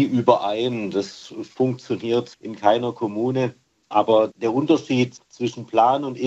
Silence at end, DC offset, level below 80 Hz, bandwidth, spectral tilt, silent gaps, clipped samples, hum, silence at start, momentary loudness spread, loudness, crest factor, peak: 0 s; under 0.1%; -70 dBFS; 8.2 kHz; -6.5 dB/octave; none; under 0.1%; none; 0 s; 10 LU; -22 LUFS; 20 dB; -2 dBFS